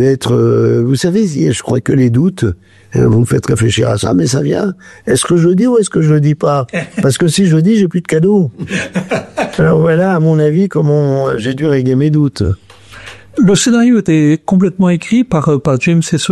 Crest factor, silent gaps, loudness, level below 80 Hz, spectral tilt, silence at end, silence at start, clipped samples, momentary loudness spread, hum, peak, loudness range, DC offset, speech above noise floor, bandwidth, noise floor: 8 dB; none; -12 LUFS; -40 dBFS; -6.5 dB/octave; 0 s; 0 s; under 0.1%; 8 LU; none; -2 dBFS; 2 LU; under 0.1%; 23 dB; 12.5 kHz; -34 dBFS